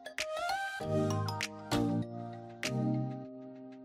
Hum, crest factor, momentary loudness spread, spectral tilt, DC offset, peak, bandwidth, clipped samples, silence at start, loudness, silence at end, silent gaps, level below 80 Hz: none; 16 dB; 12 LU; -5.5 dB/octave; under 0.1%; -20 dBFS; 16 kHz; under 0.1%; 0 s; -35 LUFS; 0 s; none; -60 dBFS